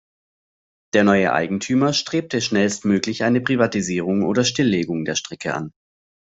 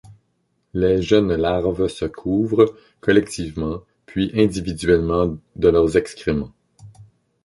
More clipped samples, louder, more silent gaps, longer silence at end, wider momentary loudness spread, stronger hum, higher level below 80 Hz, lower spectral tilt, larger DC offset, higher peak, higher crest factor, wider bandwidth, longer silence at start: neither; about the same, -20 LUFS vs -20 LUFS; neither; first, 0.55 s vs 0.4 s; second, 8 LU vs 11 LU; neither; second, -58 dBFS vs -40 dBFS; second, -4.5 dB/octave vs -6.5 dB/octave; neither; about the same, -2 dBFS vs -2 dBFS; about the same, 18 dB vs 18 dB; second, 8 kHz vs 11.5 kHz; first, 0.95 s vs 0.1 s